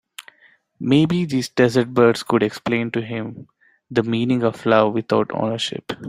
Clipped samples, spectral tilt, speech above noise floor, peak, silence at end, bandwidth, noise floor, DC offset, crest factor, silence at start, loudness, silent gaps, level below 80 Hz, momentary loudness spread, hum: under 0.1%; -6 dB/octave; 37 dB; -2 dBFS; 0 s; 15 kHz; -56 dBFS; under 0.1%; 18 dB; 0.2 s; -20 LUFS; none; -58 dBFS; 12 LU; none